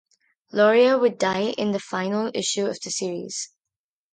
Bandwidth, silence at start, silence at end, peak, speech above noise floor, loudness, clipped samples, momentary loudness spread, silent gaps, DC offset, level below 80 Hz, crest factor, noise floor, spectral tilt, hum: 9.6 kHz; 0.55 s; 0.65 s; -6 dBFS; 67 dB; -23 LUFS; under 0.1%; 13 LU; none; under 0.1%; -70 dBFS; 18 dB; -89 dBFS; -3.5 dB/octave; none